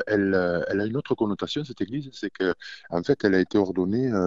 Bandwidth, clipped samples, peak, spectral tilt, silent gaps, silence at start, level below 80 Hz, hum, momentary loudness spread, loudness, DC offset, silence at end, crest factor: 7.6 kHz; under 0.1%; -8 dBFS; -7 dB/octave; none; 0 s; -56 dBFS; none; 9 LU; -26 LUFS; 0.1%; 0 s; 18 dB